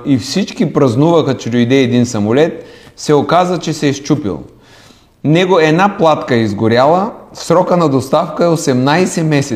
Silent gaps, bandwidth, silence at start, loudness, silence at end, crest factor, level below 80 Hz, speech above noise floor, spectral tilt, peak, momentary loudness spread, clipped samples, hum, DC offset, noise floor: none; 15 kHz; 0 s; -12 LUFS; 0 s; 12 dB; -50 dBFS; 31 dB; -6 dB/octave; 0 dBFS; 6 LU; under 0.1%; none; under 0.1%; -43 dBFS